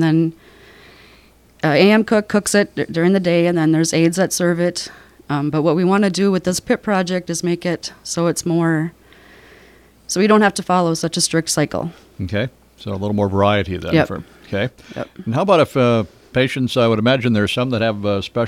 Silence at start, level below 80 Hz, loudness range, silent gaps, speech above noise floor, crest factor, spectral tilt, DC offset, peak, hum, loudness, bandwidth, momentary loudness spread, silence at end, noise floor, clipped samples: 0 s; -50 dBFS; 4 LU; none; 32 dB; 18 dB; -5 dB/octave; under 0.1%; 0 dBFS; none; -17 LUFS; 15.5 kHz; 11 LU; 0 s; -49 dBFS; under 0.1%